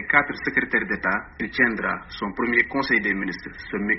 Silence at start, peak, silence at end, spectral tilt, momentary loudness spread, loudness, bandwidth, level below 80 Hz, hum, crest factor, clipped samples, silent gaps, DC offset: 0 s; -2 dBFS; 0 s; -3 dB/octave; 10 LU; -23 LUFS; 6 kHz; -50 dBFS; none; 22 dB; under 0.1%; none; under 0.1%